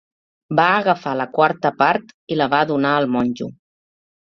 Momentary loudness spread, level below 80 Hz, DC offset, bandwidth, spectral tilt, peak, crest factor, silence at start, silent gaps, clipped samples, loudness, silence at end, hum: 8 LU; -60 dBFS; under 0.1%; 6.8 kHz; -7 dB/octave; -2 dBFS; 18 dB; 0.5 s; 2.14-2.27 s; under 0.1%; -18 LUFS; 0.7 s; none